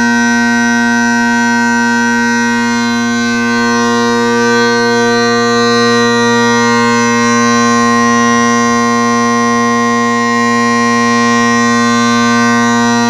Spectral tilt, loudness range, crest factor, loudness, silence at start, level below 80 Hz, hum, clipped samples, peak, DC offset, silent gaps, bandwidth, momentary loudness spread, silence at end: -3.5 dB/octave; 2 LU; 10 dB; -10 LUFS; 0 s; -48 dBFS; 60 Hz at -55 dBFS; under 0.1%; 0 dBFS; under 0.1%; none; 12.5 kHz; 2 LU; 0 s